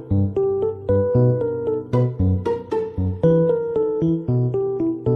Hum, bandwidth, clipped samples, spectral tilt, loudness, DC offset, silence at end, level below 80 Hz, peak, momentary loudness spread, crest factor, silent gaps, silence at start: none; 6 kHz; under 0.1%; -11 dB/octave; -21 LUFS; under 0.1%; 0 s; -44 dBFS; -6 dBFS; 6 LU; 14 dB; none; 0 s